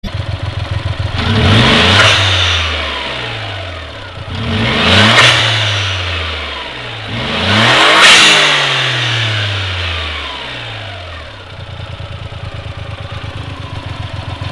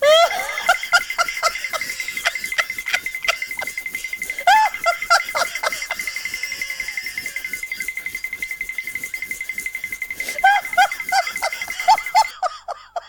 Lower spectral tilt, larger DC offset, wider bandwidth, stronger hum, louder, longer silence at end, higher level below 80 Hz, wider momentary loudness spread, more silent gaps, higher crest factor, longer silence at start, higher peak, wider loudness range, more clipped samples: first, -3.5 dB/octave vs 1 dB/octave; neither; second, 12 kHz vs 19.5 kHz; neither; first, -10 LUFS vs -20 LUFS; about the same, 0 s vs 0 s; first, -34 dBFS vs -56 dBFS; first, 20 LU vs 11 LU; neither; about the same, 14 dB vs 18 dB; about the same, 0.05 s vs 0 s; about the same, 0 dBFS vs -2 dBFS; first, 17 LU vs 6 LU; first, 0.2% vs under 0.1%